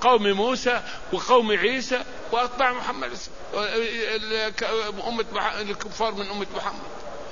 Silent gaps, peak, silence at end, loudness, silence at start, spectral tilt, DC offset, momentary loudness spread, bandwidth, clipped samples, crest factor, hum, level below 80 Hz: none; -6 dBFS; 0 s; -25 LUFS; 0 s; -3 dB/octave; 1%; 11 LU; 7.4 kHz; under 0.1%; 20 dB; none; -50 dBFS